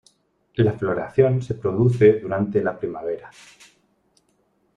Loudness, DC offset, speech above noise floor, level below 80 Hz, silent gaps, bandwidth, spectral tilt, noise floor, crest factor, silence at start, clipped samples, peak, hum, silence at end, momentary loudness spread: -21 LUFS; under 0.1%; 45 dB; -54 dBFS; none; 9.8 kHz; -9 dB/octave; -66 dBFS; 20 dB; 0.6 s; under 0.1%; -2 dBFS; none; 1.5 s; 13 LU